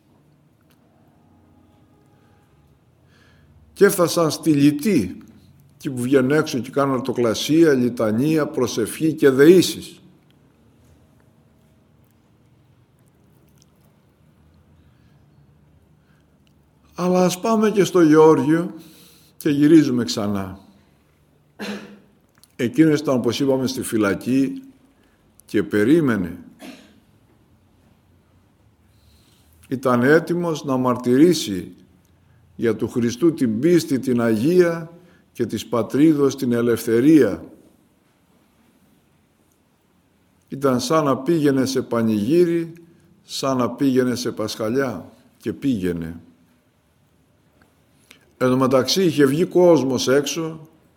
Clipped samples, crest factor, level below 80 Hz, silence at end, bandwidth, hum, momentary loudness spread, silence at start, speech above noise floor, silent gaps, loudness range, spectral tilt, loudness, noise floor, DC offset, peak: under 0.1%; 20 dB; -60 dBFS; 0.3 s; 18 kHz; none; 16 LU; 3.75 s; 43 dB; none; 8 LU; -5.5 dB/octave; -19 LUFS; -61 dBFS; under 0.1%; 0 dBFS